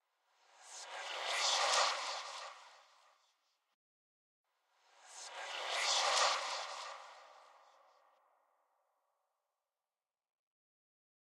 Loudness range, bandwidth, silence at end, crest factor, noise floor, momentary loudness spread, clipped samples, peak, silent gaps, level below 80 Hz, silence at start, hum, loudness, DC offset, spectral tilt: 15 LU; 16 kHz; 3.8 s; 24 dB; under -90 dBFS; 21 LU; under 0.1%; -20 dBFS; 3.74-4.44 s; under -90 dBFS; 0.6 s; none; -35 LUFS; under 0.1%; 4 dB/octave